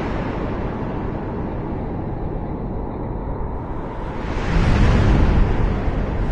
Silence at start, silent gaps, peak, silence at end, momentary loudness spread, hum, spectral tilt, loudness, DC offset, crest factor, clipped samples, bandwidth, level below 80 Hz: 0 s; none; -4 dBFS; 0 s; 11 LU; none; -8 dB/octave; -23 LUFS; under 0.1%; 16 dB; under 0.1%; 8 kHz; -24 dBFS